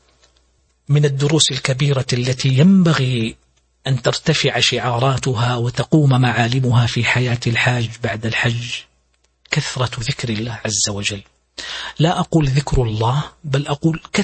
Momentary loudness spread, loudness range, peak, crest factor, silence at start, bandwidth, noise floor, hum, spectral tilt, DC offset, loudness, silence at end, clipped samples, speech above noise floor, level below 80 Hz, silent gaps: 9 LU; 5 LU; 0 dBFS; 18 dB; 0.9 s; 8.8 kHz; -62 dBFS; none; -5 dB/octave; under 0.1%; -17 LUFS; 0 s; under 0.1%; 45 dB; -40 dBFS; none